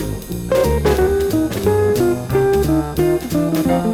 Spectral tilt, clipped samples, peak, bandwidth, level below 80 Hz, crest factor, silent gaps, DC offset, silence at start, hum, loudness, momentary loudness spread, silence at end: -6.5 dB/octave; under 0.1%; -4 dBFS; 19.5 kHz; -28 dBFS; 14 dB; none; under 0.1%; 0 s; none; -17 LUFS; 3 LU; 0 s